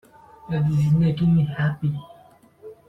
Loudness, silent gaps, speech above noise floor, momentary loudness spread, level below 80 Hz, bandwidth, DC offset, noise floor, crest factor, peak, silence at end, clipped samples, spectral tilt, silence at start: -22 LUFS; none; 32 dB; 9 LU; -48 dBFS; 6 kHz; under 0.1%; -52 dBFS; 12 dB; -10 dBFS; 0.15 s; under 0.1%; -9 dB/octave; 0.45 s